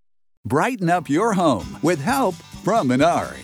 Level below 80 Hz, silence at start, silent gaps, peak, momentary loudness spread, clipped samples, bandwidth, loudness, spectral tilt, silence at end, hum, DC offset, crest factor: -50 dBFS; 0.45 s; none; -6 dBFS; 6 LU; under 0.1%; 17 kHz; -20 LUFS; -5.5 dB/octave; 0 s; none; under 0.1%; 14 dB